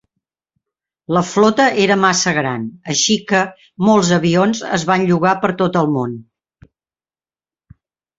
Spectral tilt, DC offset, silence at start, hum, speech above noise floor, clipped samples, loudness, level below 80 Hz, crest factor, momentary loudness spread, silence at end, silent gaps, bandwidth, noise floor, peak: -4.5 dB/octave; under 0.1%; 1.1 s; none; over 75 dB; under 0.1%; -15 LUFS; -56 dBFS; 16 dB; 8 LU; 1.95 s; none; 8 kHz; under -90 dBFS; -2 dBFS